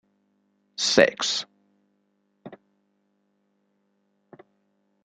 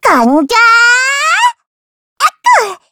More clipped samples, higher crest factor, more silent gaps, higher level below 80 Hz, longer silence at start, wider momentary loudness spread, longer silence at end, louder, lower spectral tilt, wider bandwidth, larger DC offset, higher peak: second, under 0.1% vs 0.2%; first, 28 dB vs 10 dB; second, none vs 1.67-2.16 s; second, -70 dBFS vs -52 dBFS; first, 0.8 s vs 0.05 s; first, 22 LU vs 8 LU; first, 2.5 s vs 0.15 s; second, -22 LUFS vs -8 LUFS; about the same, -2 dB/octave vs -1 dB/octave; second, 9.6 kHz vs 19.5 kHz; neither; about the same, -2 dBFS vs 0 dBFS